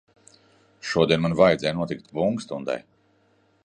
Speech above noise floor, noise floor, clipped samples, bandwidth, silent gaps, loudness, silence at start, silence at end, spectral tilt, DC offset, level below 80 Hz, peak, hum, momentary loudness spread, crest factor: 40 dB; -63 dBFS; under 0.1%; 9.8 kHz; none; -23 LUFS; 0.85 s; 0.85 s; -6 dB/octave; under 0.1%; -54 dBFS; -4 dBFS; none; 12 LU; 22 dB